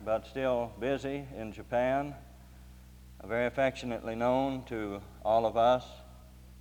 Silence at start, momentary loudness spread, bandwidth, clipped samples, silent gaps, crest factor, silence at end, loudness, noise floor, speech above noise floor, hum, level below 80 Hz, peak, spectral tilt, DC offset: 0 s; 15 LU; over 20 kHz; under 0.1%; none; 18 dB; 0 s; -32 LUFS; -52 dBFS; 21 dB; none; -52 dBFS; -14 dBFS; -6.5 dB/octave; under 0.1%